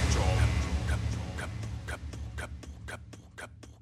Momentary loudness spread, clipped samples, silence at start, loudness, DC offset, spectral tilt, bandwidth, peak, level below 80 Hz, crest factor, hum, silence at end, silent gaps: 18 LU; under 0.1%; 0 s; -33 LUFS; under 0.1%; -5 dB/octave; 13 kHz; -14 dBFS; -36 dBFS; 18 dB; none; 0.05 s; none